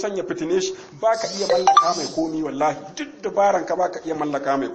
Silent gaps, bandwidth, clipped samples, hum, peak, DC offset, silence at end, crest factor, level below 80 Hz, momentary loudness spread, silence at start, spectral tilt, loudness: none; 8.8 kHz; under 0.1%; none; -2 dBFS; under 0.1%; 0 s; 20 dB; -58 dBFS; 11 LU; 0 s; -3.5 dB/octave; -21 LUFS